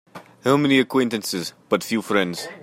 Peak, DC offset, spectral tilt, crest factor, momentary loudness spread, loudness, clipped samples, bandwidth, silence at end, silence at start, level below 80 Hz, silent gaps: -4 dBFS; under 0.1%; -4.5 dB/octave; 18 dB; 10 LU; -21 LUFS; under 0.1%; 16.5 kHz; 0 s; 0.15 s; -66 dBFS; none